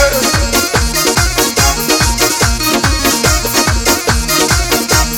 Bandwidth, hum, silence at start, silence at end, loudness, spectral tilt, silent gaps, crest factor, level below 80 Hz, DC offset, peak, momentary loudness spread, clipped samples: over 20 kHz; none; 0 s; 0 s; -11 LUFS; -2.5 dB/octave; none; 12 dB; -20 dBFS; under 0.1%; 0 dBFS; 2 LU; 0.1%